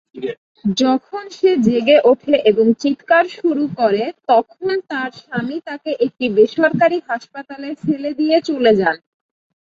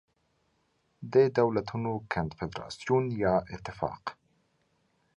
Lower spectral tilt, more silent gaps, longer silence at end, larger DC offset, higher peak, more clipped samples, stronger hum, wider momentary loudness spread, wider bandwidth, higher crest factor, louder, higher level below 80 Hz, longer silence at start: about the same, -6 dB/octave vs -7 dB/octave; first, 0.38-0.55 s vs none; second, 0.75 s vs 1.05 s; neither; first, -2 dBFS vs -12 dBFS; neither; neither; second, 12 LU vs 15 LU; second, 7.6 kHz vs 10 kHz; about the same, 16 dB vs 20 dB; first, -17 LUFS vs -29 LUFS; about the same, -58 dBFS vs -56 dBFS; second, 0.15 s vs 1 s